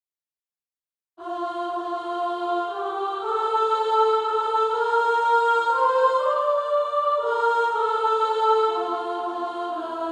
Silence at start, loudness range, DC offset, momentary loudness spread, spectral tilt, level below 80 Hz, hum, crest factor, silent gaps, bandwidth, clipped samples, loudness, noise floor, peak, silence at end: 1.2 s; 6 LU; under 0.1%; 9 LU; -2.5 dB/octave; -72 dBFS; none; 14 dB; none; 10.5 kHz; under 0.1%; -23 LUFS; under -90 dBFS; -8 dBFS; 0 s